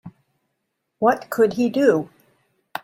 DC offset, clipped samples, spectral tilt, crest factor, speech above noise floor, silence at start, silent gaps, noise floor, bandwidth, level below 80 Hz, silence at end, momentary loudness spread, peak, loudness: under 0.1%; under 0.1%; -6 dB/octave; 18 dB; 58 dB; 0.05 s; none; -76 dBFS; 16.5 kHz; -66 dBFS; 0.05 s; 13 LU; -4 dBFS; -20 LUFS